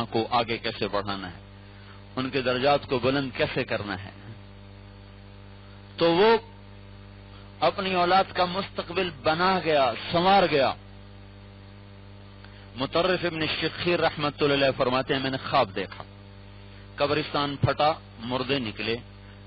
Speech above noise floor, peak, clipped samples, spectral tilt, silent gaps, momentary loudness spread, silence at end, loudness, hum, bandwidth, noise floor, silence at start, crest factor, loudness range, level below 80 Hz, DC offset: 21 dB; -12 dBFS; under 0.1%; -3 dB/octave; none; 25 LU; 0 s; -25 LUFS; 50 Hz at -50 dBFS; 5.8 kHz; -46 dBFS; 0 s; 14 dB; 4 LU; -52 dBFS; under 0.1%